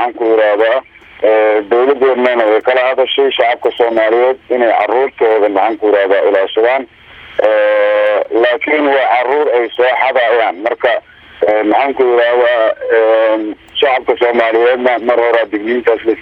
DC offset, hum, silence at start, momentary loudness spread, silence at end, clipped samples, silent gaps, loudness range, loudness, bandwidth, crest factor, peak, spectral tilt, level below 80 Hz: under 0.1%; none; 0 s; 4 LU; 0 s; under 0.1%; none; 1 LU; -12 LUFS; 5.4 kHz; 12 dB; 0 dBFS; -5 dB/octave; -56 dBFS